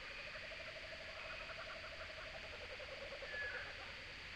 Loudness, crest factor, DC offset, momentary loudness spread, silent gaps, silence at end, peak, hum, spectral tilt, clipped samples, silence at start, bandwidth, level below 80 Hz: -48 LUFS; 16 dB; under 0.1%; 4 LU; none; 0 s; -34 dBFS; none; -3 dB/octave; under 0.1%; 0 s; 16 kHz; -64 dBFS